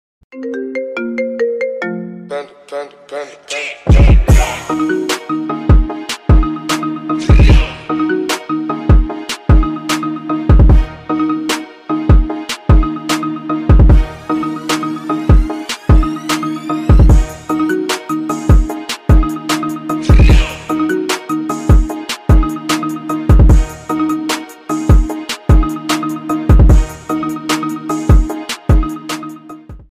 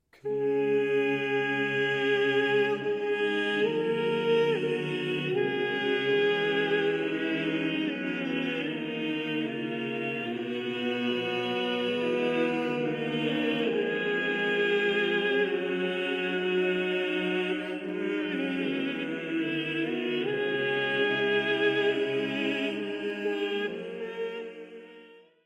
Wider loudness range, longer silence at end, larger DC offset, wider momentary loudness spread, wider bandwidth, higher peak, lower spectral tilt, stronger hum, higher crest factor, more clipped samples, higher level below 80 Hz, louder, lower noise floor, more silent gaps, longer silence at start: second, 1 LU vs 4 LU; about the same, 0.15 s vs 0.25 s; neither; first, 12 LU vs 7 LU; first, 15 kHz vs 9 kHz; first, -2 dBFS vs -14 dBFS; about the same, -6 dB/octave vs -6 dB/octave; neither; about the same, 12 dB vs 14 dB; neither; first, -14 dBFS vs -74 dBFS; first, -14 LUFS vs -28 LUFS; second, -33 dBFS vs -53 dBFS; neither; about the same, 0.35 s vs 0.25 s